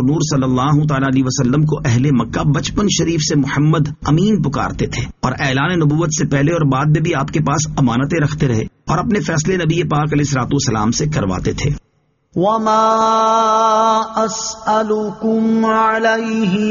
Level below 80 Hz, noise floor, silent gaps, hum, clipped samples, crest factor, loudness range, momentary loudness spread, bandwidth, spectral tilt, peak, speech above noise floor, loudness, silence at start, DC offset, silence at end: -36 dBFS; -59 dBFS; none; none; under 0.1%; 12 dB; 2 LU; 6 LU; 7.4 kHz; -5.5 dB/octave; -2 dBFS; 44 dB; -15 LUFS; 0 s; under 0.1%; 0 s